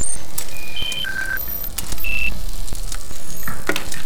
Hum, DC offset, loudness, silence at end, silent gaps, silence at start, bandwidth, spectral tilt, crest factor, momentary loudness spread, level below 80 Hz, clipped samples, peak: none; 20%; -25 LUFS; 0 s; none; 0 s; over 20 kHz; -2 dB/octave; 16 dB; 9 LU; -30 dBFS; under 0.1%; -2 dBFS